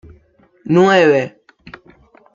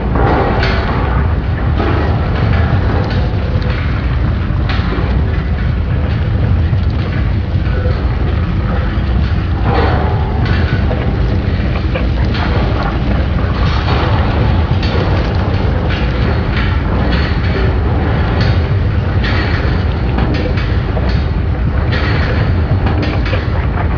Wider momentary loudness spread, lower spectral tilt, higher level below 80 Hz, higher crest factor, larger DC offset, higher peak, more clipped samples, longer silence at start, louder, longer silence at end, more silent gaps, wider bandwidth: first, 19 LU vs 3 LU; second, -6.5 dB/octave vs -8.5 dB/octave; second, -56 dBFS vs -16 dBFS; about the same, 16 dB vs 12 dB; second, under 0.1% vs 0.4%; about the same, -2 dBFS vs 0 dBFS; neither; first, 0.65 s vs 0 s; about the same, -13 LUFS vs -15 LUFS; first, 1.05 s vs 0 s; neither; first, 7.6 kHz vs 5.4 kHz